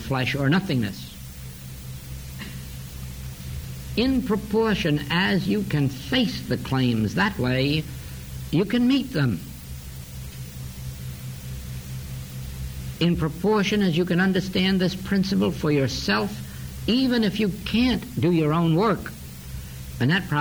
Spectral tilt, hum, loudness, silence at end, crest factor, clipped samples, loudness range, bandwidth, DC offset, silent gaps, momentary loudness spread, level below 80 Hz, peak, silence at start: -6 dB/octave; none; -23 LUFS; 0 s; 16 dB; under 0.1%; 9 LU; over 20 kHz; under 0.1%; none; 16 LU; -42 dBFS; -10 dBFS; 0 s